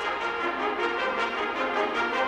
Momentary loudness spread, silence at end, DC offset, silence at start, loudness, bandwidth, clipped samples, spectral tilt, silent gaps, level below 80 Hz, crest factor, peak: 2 LU; 0 s; under 0.1%; 0 s; -27 LUFS; 13 kHz; under 0.1%; -3.5 dB/octave; none; -60 dBFS; 14 dB; -14 dBFS